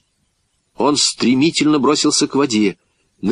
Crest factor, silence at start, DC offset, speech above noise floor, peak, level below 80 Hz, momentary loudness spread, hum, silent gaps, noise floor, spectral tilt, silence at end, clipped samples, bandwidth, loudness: 16 dB; 0.8 s; under 0.1%; 51 dB; -2 dBFS; -60 dBFS; 5 LU; none; none; -66 dBFS; -3.5 dB/octave; 0 s; under 0.1%; 11 kHz; -15 LUFS